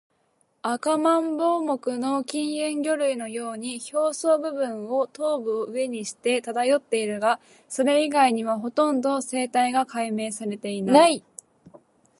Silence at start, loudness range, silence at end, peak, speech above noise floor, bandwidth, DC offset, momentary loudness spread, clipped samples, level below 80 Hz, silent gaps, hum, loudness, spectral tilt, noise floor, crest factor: 0.65 s; 3 LU; 0.45 s; -4 dBFS; 44 dB; 11.5 kHz; under 0.1%; 9 LU; under 0.1%; -78 dBFS; none; none; -24 LUFS; -3.5 dB/octave; -68 dBFS; 20 dB